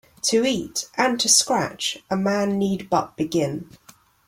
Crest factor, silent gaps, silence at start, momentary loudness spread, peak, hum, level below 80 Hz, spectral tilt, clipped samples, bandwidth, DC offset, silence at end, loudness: 20 dB; none; 0.25 s; 10 LU; -4 dBFS; none; -58 dBFS; -3 dB/octave; under 0.1%; 16.5 kHz; under 0.1%; 0.65 s; -21 LUFS